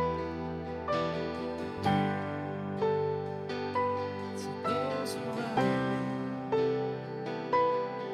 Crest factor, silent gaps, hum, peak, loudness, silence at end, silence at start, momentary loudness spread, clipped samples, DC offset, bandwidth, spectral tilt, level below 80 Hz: 18 dB; none; none; -14 dBFS; -33 LUFS; 0 s; 0 s; 8 LU; under 0.1%; under 0.1%; 14.5 kHz; -6.5 dB/octave; -60 dBFS